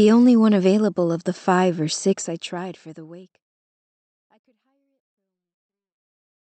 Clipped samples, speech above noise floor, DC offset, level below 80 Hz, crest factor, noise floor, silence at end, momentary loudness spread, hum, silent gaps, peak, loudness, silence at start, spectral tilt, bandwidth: under 0.1%; 50 dB; under 0.1%; -74 dBFS; 16 dB; -69 dBFS; 3.2 s; 21 LU; none; none; -6 dBFS; -19 LUFS; 0 s; -6 dB/octave; 8.8 kHz